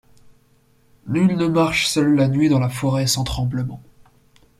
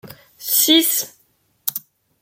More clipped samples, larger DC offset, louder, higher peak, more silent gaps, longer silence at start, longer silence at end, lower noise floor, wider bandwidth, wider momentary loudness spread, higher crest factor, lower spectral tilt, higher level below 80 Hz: neither; neither; second, -19 LUFS vs -16 LUFS; about the same, -4 dBFS vs -2 dBFS; neither; first, 1.05 s vs 0.05 s; first, 0.8 s vs 0.4 s; second, -57 dBFS vs -62 dBFS; about the same, 15.5 kHz vs 17 kHz; second, 9 LU vs 19 LU; about the same, 16 dB vs 20 dB; first, -5.5 dB/octave vs -0.5 dB/octave; first, -42 dBFS vs -70 dBFS